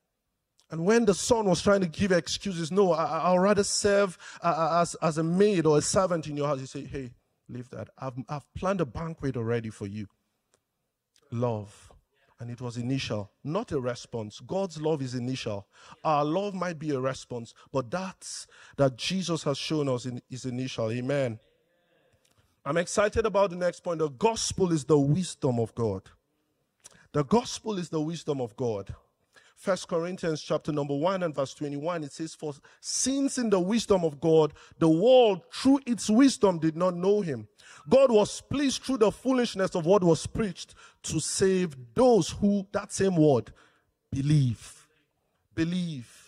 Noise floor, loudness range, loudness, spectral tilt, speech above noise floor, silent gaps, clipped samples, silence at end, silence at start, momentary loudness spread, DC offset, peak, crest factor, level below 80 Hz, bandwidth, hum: -82 dBFS; 10 LU; -27 LUFS; -5.5 dB/octave; 55 dB; none; under 0.1%; 0.25 s; 0.7 s; 15 LU; under 0.1%; -8 dBFS; 20 dB; -56 dBFS; 14 kHz; none